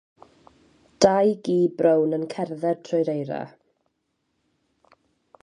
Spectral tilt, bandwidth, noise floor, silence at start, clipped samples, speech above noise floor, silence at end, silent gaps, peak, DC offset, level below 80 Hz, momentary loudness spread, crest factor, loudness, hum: -6 dB/octave; 11 kHz; -75 dBFS; 1 s; under 0.1%; 53 dB; 1.95 s; none; -2 dBFS; under 0.1%; -64 dBFS; 12 LU; 22 dB; -23 LUFS; none